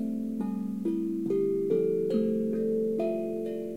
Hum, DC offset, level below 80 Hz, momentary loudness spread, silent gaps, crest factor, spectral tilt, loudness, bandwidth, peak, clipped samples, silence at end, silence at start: none; 0.2%; -66 dBFS; 5 LU; none; 14 dB; -9 dB/octave; -29 LUFS; 15.5 kHz; -16 dBFS; under 0.1%; 0 s; 0 s